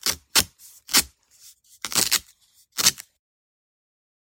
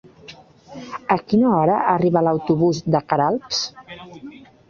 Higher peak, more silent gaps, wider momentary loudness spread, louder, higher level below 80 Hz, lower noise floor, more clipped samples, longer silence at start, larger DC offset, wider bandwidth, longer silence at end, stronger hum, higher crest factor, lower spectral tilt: about the same, 0 dBFS vs -2 dBFS; neither; second, 15 LU vs 21 LU; about the same, -21 LUFS vs -19 LUFS; about the same, -56 dBFS vs -56 dBFS; first, -58 dBFS vs -44 dBFS; neither; second, 0.05 s vs 0.3 s; neither; first, 17 kHz vs 7.4 kHz; first, 1.2 s vs 0.4 s; neither; first, 28 dB vs 18 dB; second, 0.5 dB/octave vs -6 dB/octave